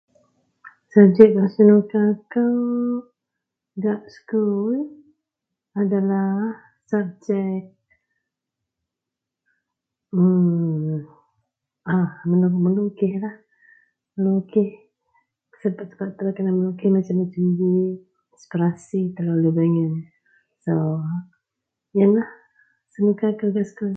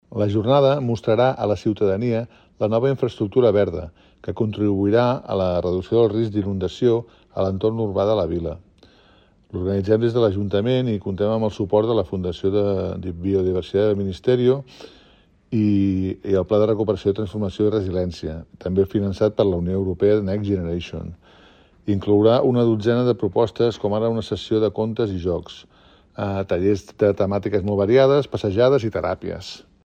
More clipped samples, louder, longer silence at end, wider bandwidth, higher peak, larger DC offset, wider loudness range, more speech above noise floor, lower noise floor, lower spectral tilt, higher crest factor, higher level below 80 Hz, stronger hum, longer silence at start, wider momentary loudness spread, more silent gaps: neither; about the same, -21 LUFS vs -21 LUFS; second, 0 s vs 0.25 s; second, 7.2 kHz vs 8.4 kHz; first, 0 dBFS vs -4 dBFS; neither; first, 8 LU vs 3 LU; first, 66 dB vs 34 dB; first, -85 dBFS vs -55 dBFS; first, -10.5 dB/octave vs -8 dB/octave; first, 22 dB vs 16 dB; second, -68 dBFS vs -48 dBFS; neither; first, 0.65 s vs 0.1 s; first, 15 LU vs 10 LU; neither